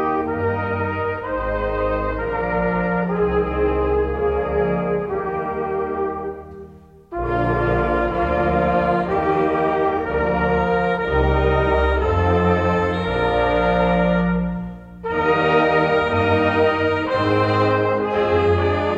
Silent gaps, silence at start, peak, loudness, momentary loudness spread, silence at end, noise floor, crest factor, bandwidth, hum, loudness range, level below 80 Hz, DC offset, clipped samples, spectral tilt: none; 0 s; -6 dBFS; -20 LUFS; 6 LU; 0 s; -43 dBFS; 14 dB; 7.8 kHz; none; 5 LU; -32 dBFS; under 0.1%; under 0.1%; -8 dB/octave